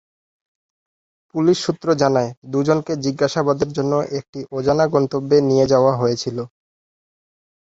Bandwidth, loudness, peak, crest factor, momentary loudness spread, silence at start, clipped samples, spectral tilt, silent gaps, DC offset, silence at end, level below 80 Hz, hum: 8 kHz; -19 LUFS; -2 dBFS; 18 dB; 11 LU; 1.35 s; under 0.1%; -6 dB/octave; 2.37-2.42 s, 4.29-4.33 s; under 0.1%; 1.2 s; -54 dBFS; none